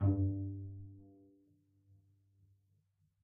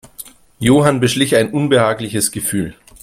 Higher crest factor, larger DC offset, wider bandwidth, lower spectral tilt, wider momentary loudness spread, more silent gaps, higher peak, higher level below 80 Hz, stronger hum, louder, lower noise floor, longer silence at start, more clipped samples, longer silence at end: about the same, 18 dB vs 16 dB; neither; second, 1.8 kHz vs 16.5 kHz; first, -13 dB/octave vs -4.5 dB/octave; first, 22 LU vs 18 LU; neither; second, -22 dBFS vs 0 dBFS; second, -64 dBFS vs -46 dBFS; neither; second, -39 LUFS vs -15 LUFS; first, -77 dBFS vs -38 dBFS; second, 0 s vs 0.2 s; neither; first, 2.15 s vs 0.3 s